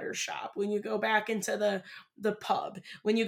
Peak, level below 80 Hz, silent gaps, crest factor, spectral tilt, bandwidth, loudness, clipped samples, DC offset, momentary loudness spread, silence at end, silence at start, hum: -14 dBFS; -84 dBFS; none; 18 dB; -3.5 dB/octave; 18 kHz; -32 LUFS; under 0.1%; under 0.1%; 8 LU; 0 s; 0 s; none